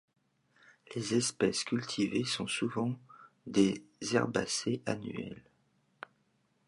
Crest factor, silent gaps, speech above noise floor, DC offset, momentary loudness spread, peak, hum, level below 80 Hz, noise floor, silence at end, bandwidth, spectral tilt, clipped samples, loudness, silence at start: 22 dB; none; 41 dB; under 0.1%; 22 LU; -12 dBFS; none; -70 dBFS; -74 dBFS; 1.3 s; 11.5 kHz; -4 dB/octave; under 0.1%; -33 LUFS; 0.9 s